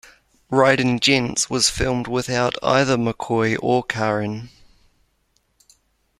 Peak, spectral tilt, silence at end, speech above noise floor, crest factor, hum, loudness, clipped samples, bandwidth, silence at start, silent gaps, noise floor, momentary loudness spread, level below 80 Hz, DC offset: -2 dBFS; -4 dB/octave; 1.7 s; 47 dB; 20 dB; none; -19 LUFS; under 0.1%; 14.5 kHz; 0.5 s; none; -66 dBFS; 7 LU; -44 dBFS; under 0.1%